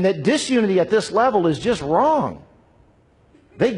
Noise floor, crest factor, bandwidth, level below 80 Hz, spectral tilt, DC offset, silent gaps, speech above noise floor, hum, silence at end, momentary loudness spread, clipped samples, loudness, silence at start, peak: -55 dBFS; 14 dB; 11 kHz; -52 dBFS; -5.5 dB/octave; under 0.1%; none; 37 dB; none; 0 s; 5 LU; under 0.1%; -19 LUFS; 0 s; -6 dBFS